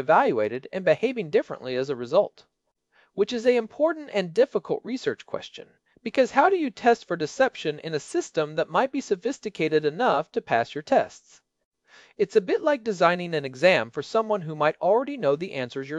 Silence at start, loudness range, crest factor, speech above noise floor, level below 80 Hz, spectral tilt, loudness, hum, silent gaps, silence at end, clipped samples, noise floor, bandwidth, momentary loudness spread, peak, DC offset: 0 s; 3 LU; 20 dB; 43 dB; -70 dBFS; -5 dB/octave; -25 LUFS; none; 11.65-11.71 s; 0 s; under 0.1%; -67 dBFS; 10 kHz; 10 LU; -4 dBFS; under 0.1%